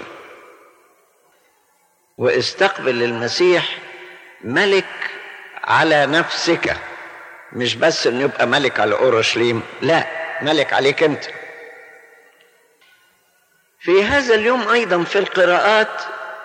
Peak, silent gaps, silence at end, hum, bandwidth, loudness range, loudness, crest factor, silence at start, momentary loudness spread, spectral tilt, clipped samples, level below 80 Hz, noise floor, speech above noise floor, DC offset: -2 dBFS; none; 0 s; none; 9.8 kHz; 5 LU; -17 LUFS; 16 dB; 0 s; 19 LU; -4 dB/octave; under 0.1%; -54 dBFS; -60 dBFS; 43 dB; under 0.1%